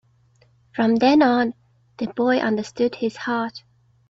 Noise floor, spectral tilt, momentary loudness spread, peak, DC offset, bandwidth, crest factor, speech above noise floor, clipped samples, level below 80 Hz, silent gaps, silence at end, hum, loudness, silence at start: -58 dBFS; -5.5 dB/octave; 14 LU; -6 dBFS; under 0.1%; 7.8 kHz; 16 dB; 38 dB; under 0.1%; -62 dBFS; none; 0.5 s; none; -21 LUFS; 0.75 s